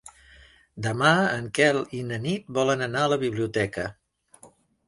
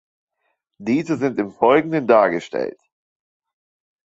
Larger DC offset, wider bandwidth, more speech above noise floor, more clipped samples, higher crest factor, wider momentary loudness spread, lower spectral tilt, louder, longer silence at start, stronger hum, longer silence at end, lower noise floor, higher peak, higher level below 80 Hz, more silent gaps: neither; first, 11.5 kHz vs 8 kHz; second, 31 dB vs 54 dB; neither; about the same, 22 dB vs 20 dB; about the same, 11 LU vs 11 LU; second, -5 dB/octave vs -7 dB/octave; second, -25 LUFS vs -19 LUFS; second, 0.05 s vs 0.8 s; neither; second, 0.4 s vs 1.4 s; second, -55 dBFS vs -73 dBFS; about the same, -4 dBFS vs -2 dBFS; first, -58 dBFS vs -66 dBFS; neither